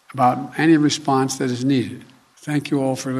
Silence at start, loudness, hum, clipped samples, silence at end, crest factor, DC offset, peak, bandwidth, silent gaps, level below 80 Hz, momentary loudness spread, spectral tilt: 0.15 s; -19 LUFS; none; under 0.1%; 0 s; 16 dB; under 0.1%; -4 dBFS; 14 kHz; none; -66 dBFS; 11 LU; -5.5 dB/octave